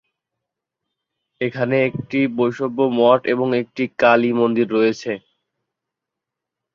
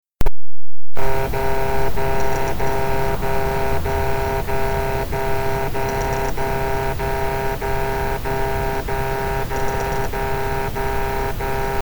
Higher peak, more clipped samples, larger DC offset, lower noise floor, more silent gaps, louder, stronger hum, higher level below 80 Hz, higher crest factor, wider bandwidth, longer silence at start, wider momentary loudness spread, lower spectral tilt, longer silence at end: about the same, -2 dBFS vs -4 dBFS; neither; neither; second, -84 dBFS vs under -90 dBFS; neither; first, -18 LUFS vs -23 LUFS; neither; second, -64 dBFS vs -28 dBFS; first, 18 dB vs 12 dB; second, 7.2 kHz vs over 20 kHz; first, 1.4 s vs 0.2 s; first, 11 LU vs 2 LU; first, -7 dB/octave vs -5.5 dB/octave; first, 1.55 s vs 0 s